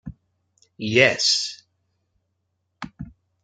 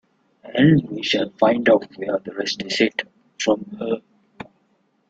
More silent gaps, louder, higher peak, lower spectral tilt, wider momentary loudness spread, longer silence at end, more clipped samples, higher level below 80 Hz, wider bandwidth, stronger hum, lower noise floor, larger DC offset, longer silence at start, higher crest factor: neither; about the same, -19 LUFS vs -21 LUFS; about the same, -2 dBFS vs -4 dBFS; second, -2.5 dB/octave vs -5.5 dB/octave; first, 25 LU vs 21 LU; second, 0.35 s vs 0.65 s; neither; about the same, -56 dBFS vs -60 dBFS; first, 10 kHz vs 8 kHz; neither; first, -75 dBFS vs -65 dBFS; neither; second, 0.05 s vs 0.45 s; first, 24 dB vs 18 dB